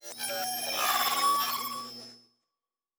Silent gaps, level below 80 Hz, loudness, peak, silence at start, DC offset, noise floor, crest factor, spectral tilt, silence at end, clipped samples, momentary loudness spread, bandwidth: none; -78 dBFS; -28 LUFS; -16 dBFS; 0.05 s; under 0.1%; under -90 dBFS; 16 dB; 0.5 dB/octave; 0.8 s; under 0.1%; 17 LU; over 20 kHz